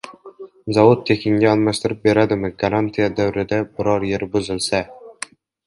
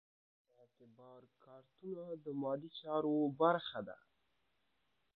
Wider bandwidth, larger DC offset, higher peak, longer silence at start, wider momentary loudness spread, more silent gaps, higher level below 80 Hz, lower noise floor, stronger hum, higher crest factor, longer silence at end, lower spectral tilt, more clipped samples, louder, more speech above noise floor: first, 11.5 kHz vs 4.6 kHz; neither; first, 0 dBFS vs -18 dBFS; second, 0.05 s vs 0.8 s; about the same, 19 LU vs 18 LU; neither; first, -48 dBFS vs -86 dBFS; second, -40 dBFS vs -83 dBFS; neither; second, 18 dB vs 24 dB; second, 0.55 s vs 1.25 s; about the same, -6 dB/octave vs -5 dB/octave; neither; first, -18 LUFS vs -39 LUFS; second, 22 dB vs 43 dB